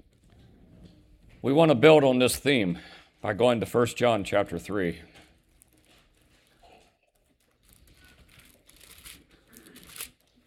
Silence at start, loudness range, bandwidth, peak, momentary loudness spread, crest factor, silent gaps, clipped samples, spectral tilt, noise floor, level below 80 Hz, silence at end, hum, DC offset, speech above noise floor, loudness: 1.45 s; 16 LU; 17 kHz; -4 dBFS; 27 LU; 24 dB; none; under 0.1%; -5 dB/octave; -69 dBFS; -58 dBFS; 0.4 s; none; under 0.1%; 46 dB; -24 LUFS